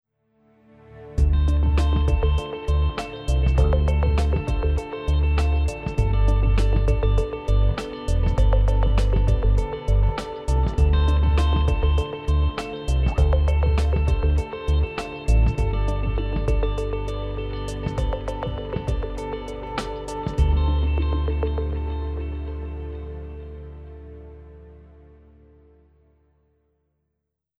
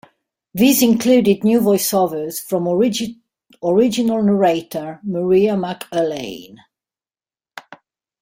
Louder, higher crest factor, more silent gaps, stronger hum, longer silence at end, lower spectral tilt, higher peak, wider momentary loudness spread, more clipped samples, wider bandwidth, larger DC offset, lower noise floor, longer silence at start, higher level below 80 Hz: second, -23 LUFS vs -17 LUFS; about the same, 14 dB vs 16 dB; neither; neither; first, 2.85 s vs 0.6 s; first, -7.5 dB/octave vs -5 dB/octave; second, -8 dBFS vs -2 dBFS; second, 11 LU vs 14 LU; neither; second, 9.4 kHz vs 16.5 kHz; neither; second, -79 dBFS vs under -90 dBFS; first, 0.95 s vs 0.55 s; first, -24 dBFS vs -58 dBFS